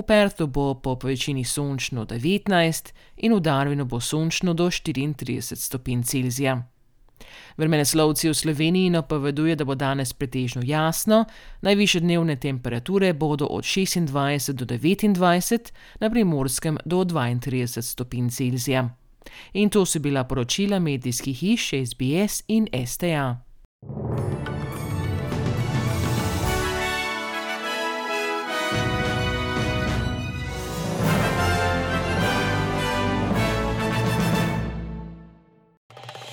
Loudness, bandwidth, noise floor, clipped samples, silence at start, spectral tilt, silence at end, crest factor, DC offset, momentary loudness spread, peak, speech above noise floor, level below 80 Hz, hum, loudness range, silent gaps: -24 LUFS; over 20 kHz; -53 dBFS; under 0.1%; 0 s; -5 dB/octave; 0 s; 18 dB; under 0.1%; 9 LU; -6 dBFS; 31 dB; -42 dBFS; none; 4 LU; 23.65-23.79 s, 35.77-35.89 s